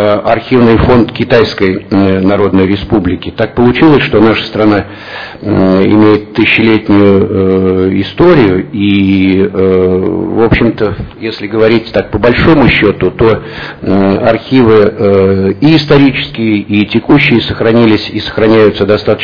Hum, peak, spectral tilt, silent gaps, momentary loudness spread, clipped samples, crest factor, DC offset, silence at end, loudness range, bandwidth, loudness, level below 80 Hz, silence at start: none; 0 dBFS; -8.5 dB/octave; none; 8 LU; 3%; 8 dB; 1%; 0 s; 2 LU; 5.4 kHz; -8 LUFS; -30 dBFS; 0 s